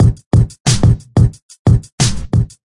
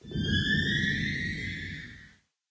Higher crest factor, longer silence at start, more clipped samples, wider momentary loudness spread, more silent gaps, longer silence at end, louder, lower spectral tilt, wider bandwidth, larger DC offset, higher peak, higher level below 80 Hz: about the same, 12 dB vs 16 dB; about the same, 0 s vs 0.05 s; neither; second, 5 LU vs 14 LU; first, 0.26-0.31 s, 0.60-0.65 s, 1.42-1.49 s, 1.59-1.65 s, 1.92-1.98 s vs none; second, 0.2 s vs 0.4 s; first, -14 LUFS vs -29 LUFS; about the same, -5.5 dB/octave vs -5 dB/octave; first, 11.5 kHz vs 8 kHz; neither; first, -2 dBFS vs -16 dBFS; first, -24 dBFS vs -44 dBFS